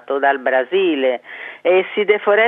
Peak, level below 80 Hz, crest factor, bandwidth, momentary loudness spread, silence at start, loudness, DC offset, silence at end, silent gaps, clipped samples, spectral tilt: -2 dBFS; -86 dBFS; 16 dB; 3.9 kHz; 7 LU; 0.1 s; -17 LUFS; under 0.1%; 0 s; none; under 0.1%; -7 dB/octave